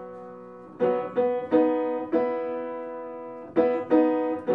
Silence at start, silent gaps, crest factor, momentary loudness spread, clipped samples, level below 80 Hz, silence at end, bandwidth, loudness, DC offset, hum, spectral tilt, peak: 0 s; none; 18 dB; 18 LU; under 0.1%; -70 dBFS; 0 s; 4.8 kHz; -25 LUFS; under 0.1%; none; -9 dB/octave; -8 dBFS